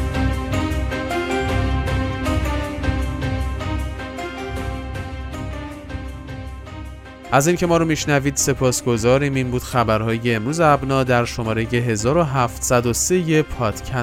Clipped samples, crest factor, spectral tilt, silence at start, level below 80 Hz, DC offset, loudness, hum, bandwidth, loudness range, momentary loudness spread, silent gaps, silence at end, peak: under 0.1%; 18 dB; -5 dB/octave; 0 s; -30 dBFS; under 0.1%; -20 LUFS; none; 16.5 kHz; 9 LU; 15 LU; none; 0 s; -2 dBFS